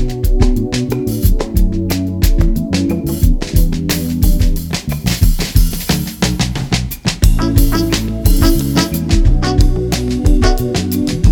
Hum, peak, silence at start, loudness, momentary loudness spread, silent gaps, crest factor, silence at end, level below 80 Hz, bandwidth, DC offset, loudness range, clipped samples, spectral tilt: none; 0 dBFS; 0 s; -15 LUFS; 4 LU; none; 12 dB; 0 s; -14 dBFS; 19 kHz; under 0.1%; 2 LU; under 0.1%; -5.5 dB/octave